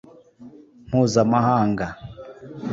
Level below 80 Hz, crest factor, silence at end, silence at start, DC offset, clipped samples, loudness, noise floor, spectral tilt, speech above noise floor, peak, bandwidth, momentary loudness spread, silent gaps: -52 dBFS; 18 dB; 0 s; 0.4 s; under 0.1%; under 0.1%; -20 LUFS; -46 dBFS; -6.5 dB/octave; 27 dB; -4 dBFS; 8 kHz; 21 LU; none